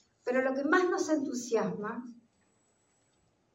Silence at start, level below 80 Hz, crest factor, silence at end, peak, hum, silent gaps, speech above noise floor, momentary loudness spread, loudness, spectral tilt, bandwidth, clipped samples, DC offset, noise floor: 0.25 s; -84 dBFS; 18 dB; 1.4 s; -14 dBFS; none; none; 42 dB; 12 LU; -31 LUFS; -4.5 dB/octave; 16 kHz; under 0.1%; under 0.1%; -72 dBFS